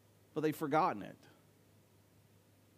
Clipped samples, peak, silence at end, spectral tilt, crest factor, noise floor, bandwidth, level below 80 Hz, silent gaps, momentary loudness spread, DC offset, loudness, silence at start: under 0.1%; -18 dBFS; 1.65 s; -6.5 dB/octave; 22 dB; -67 dBFS; 15.5 kHz; -86 dBFS; none; 13 LU; under 0.1%; -36 LUFS; 0.35 s